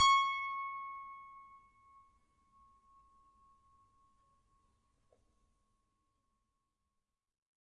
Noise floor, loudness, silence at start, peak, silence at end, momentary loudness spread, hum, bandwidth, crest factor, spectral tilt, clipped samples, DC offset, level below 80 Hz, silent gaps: -88 dBFS; -35 LUFS; 0 s; -18 dBFS; 6.3 s; 25 LU; none; 10 kHz; 24 dB; 2.5 dB/octave; under 0.1%; under 0.1%; -76 dBFS; none